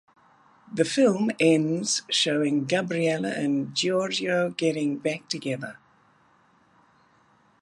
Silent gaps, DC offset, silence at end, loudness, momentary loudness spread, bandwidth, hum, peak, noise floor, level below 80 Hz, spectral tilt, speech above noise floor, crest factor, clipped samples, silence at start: none; under 0.1%; 1.9 s; -25 LUFS; 9 LU; 11.5 kHz; none; -6 dBFS; -62 dBFS; -74 dBFS; -4 dB/octave; 37 dB; 20 dB; under 0.1%; 0.7 s